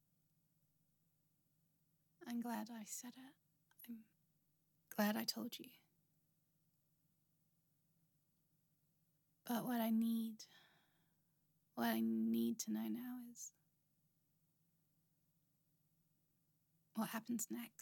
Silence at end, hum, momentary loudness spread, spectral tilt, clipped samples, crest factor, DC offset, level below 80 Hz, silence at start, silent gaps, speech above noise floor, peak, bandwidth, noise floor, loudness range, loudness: 0.15 s; none; 18 LU; -4 dB/octave; under 0.1%; 22 dB; under 0.1%; under -90 dBFS; 2.2 s; none; 39 dB; -26 dBFS; 17.5 kHz; -82 dBFS; 11 LU; -43 LUFS